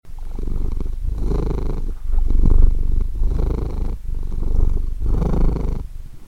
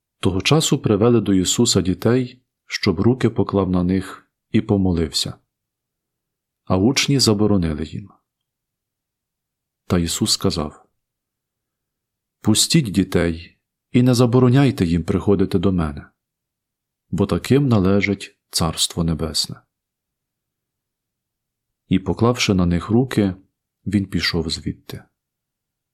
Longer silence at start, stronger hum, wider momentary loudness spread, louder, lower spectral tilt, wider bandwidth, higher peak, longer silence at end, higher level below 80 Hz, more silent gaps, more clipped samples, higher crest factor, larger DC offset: second, 0.05 s vs 0.25 s; neither; about the same, 10 LU vs 12 LU; second, -24 LUFS vs -19 LUFS; first, -9 dB/octave vs -5 dB/octave; second, 2.4 kHz vs 16 kHz; about the same, 0 dBFS vs -2 dBFS; second, 0 s vs 0.95 s; first, -18 dBFS vs -46 dBFS; neither; neither; about the same, 16 dB vs 18 dB; neither